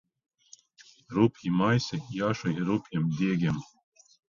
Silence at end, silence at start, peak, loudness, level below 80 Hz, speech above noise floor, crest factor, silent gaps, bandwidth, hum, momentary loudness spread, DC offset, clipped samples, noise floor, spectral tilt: 0.7 s; 1.1 s; -10 dBFS; -28 LUFS; -62 dBFS; 31 dB; 20 dB; none; 7.4 kHz; none; 6 LU; under 0.1%; under 0.1%; -58 dBFS; -7 dB/octave